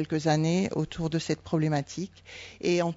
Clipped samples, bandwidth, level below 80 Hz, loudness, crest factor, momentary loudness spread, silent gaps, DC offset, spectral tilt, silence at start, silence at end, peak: under 0.1%; 7.8 kHz; -56 dBFS; -28 LUFS; 16 dB; 13 LU; none; under 0.1%; -6 dB/octave; 0 s; 0 s; -12 dBFS